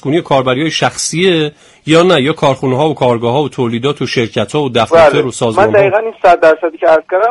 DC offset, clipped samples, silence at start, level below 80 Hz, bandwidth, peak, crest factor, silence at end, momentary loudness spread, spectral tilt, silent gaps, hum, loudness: under 0.1%; under 0.1%; 0.05 s; -46 dBFS; 11.5 kHz; 0 dBFS; 10 dB; 0 s; 7 LU; -5 dB/octave; none; none; -11 LUFS